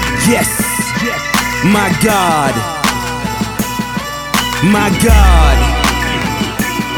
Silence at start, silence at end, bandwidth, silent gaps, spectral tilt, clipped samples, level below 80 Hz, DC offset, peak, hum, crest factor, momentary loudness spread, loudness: 0 s; 0 s; over 20 kHz; none; -4 dB/octave; under 0.1%; -18 dBFS; under 0.1%; 0 dBFS; none; 12 dB; 9 LU; -13 LUFS